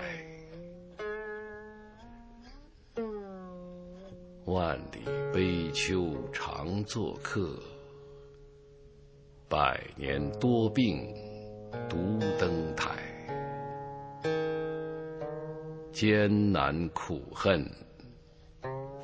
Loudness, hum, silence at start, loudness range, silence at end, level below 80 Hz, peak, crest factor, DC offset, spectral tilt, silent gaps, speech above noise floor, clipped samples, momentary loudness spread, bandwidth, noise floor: -33 LUFS; none; 0 s; 11 LU; 0 s; -52 dBFS; -10 dBFS; 24 dB; under 0.1%; -6 dB/octave; none; 25 dB; under 0.1%; 21 LU; 8 kHz; -55 dBFS